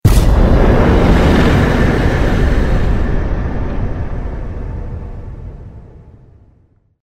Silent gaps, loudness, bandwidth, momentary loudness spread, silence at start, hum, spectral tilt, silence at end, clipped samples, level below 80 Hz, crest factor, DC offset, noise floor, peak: none; -14 LUFS; 16 kHz; 19 LU; 0.05 s; none; -7 dB/octave; 1.15 s; under 0.1%; -16 dBFS; 12 dB; under 0.1%; -52 dBFS; 0 dBFS